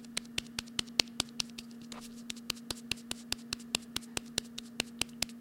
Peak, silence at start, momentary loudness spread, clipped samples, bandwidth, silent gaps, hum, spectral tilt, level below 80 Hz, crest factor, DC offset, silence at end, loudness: 0 dBFS; 0 s; 14 LU; under 0.1%; 17 kHz; none; none; -1.5 dB/octave; -60 dBFS; 38 dB; under 0.1%; 0 s; -37 LUFS